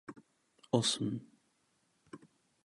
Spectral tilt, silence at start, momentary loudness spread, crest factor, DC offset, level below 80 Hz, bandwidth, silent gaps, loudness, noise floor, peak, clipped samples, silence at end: -4.5 dB/octave; 0.1 s; 25 LU; 26 dB; under 0.1%; -76 dBFS; 11.5 kHz; none; -34 LUFS; -76 dBFS; -14 dBFS; under 0.1%; 0.5 s